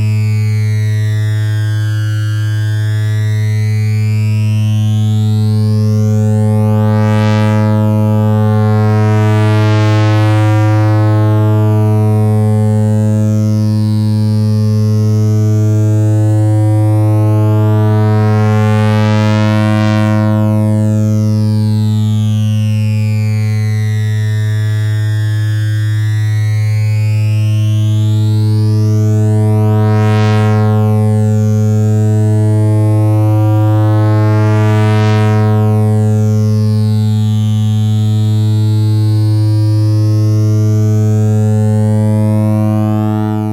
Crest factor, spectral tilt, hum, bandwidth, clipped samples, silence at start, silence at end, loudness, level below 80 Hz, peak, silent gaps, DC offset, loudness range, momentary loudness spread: 6 dB; -8 dB/octave; none; 9.8 kHz; under 0.1%; 0 s; 0 s; -12 LUFS; -50 dBFS; -4 dBFS; none; under 0.1%; 3 LU; 3 LU